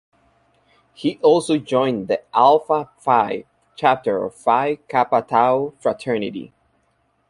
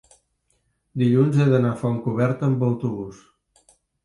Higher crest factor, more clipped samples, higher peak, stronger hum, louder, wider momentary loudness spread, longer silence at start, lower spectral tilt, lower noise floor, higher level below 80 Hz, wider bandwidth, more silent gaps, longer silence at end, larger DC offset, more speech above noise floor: about the same, 18 dB vs 16 dB; neither; first, -2 dBFS vs -6 dBFS; neither; about the same, -19 LUFS vs -21 LUFS; second, 9 LU vs 14 LU; about the same, 1 s vs 0.95 s; second, -5.5 dB/octave vs -9 dB/octave; second, -65 dBFS vs -69 dBFS; about the same, -62 dBFS vs -60 dBFS; about the same, 11.5 kHz vs 11 kHz; neither; about the same, 0.8 s vs 0.9 s; neither; about the same, 46 dB vs 49 dB